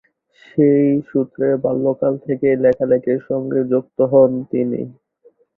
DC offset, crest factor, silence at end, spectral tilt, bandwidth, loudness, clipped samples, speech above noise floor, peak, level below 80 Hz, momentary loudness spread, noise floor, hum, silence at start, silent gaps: under 0.1%; 16 dB; 0.65 s; -11.5 dB/octave; 4 kHz; -17 LUFS; under 0.1%; 38 dB; -2 dBFS; -58 dBFS; 8 LU; -54 dBFS; none; 0.55 s; none